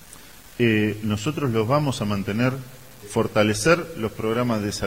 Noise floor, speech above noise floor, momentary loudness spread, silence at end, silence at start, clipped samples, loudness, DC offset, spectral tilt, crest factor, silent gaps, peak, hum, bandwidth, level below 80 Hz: -45 dBFS; 23 dB; 19 LU; 0 s; 0 s; under 0.1%; -23 LUFS; 0.4%; -5.5 dB/octave; 22 dB; none; -2 dBFS; none; 16 kHz; -50 dBFS